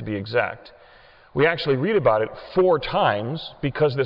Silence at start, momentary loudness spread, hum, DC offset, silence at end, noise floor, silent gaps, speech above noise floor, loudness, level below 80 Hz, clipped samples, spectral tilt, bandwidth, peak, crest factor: 0 s; 10 LU; none; under 0.1%; 0 s; -51 dBFS; none; 29 dB; -22 LUFS; -50 dBFS; under 0.1%; -9 dB/octave; 5.8 kHz; -6 dBFS; 16 dB